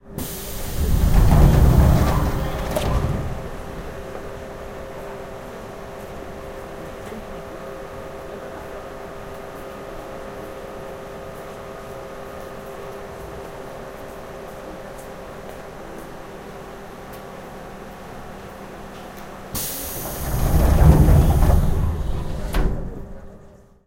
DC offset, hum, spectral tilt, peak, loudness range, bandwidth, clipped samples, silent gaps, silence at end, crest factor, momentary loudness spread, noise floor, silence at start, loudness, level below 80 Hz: under 0.1%; none; -6.5 dB/octave; 0 dBFS; 17 LU; 16 kHz; under 0.1%; none; 0.3 s; 22 dB; 21 LU; -46 dBFS; 0.05 s; -23 LUFS; -24 dBFS